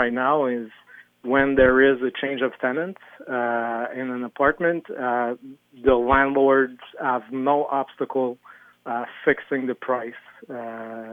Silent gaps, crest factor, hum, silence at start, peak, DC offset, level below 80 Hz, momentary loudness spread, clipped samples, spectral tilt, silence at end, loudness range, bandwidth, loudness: none; 18 dB; none; 0 s; -4 dBFS; under 0.1%; -48 dBFS; 16 LU; under 0.1%; -8 dB/octave; 0 s; 4 LU; 3.8 kHz; -22 LUFS